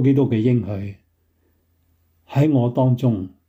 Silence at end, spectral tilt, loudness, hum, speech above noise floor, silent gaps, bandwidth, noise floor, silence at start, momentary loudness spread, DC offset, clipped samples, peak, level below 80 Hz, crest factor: 0.2 s; -10 dB/octave; -19 LUFS; none; 45 dB; none; 7.4 kHz; -64 dBFS; 0 s; 12 LU; under 0.1%; under 0.1%; -6 dBFS; -60 dBFS; 14 dB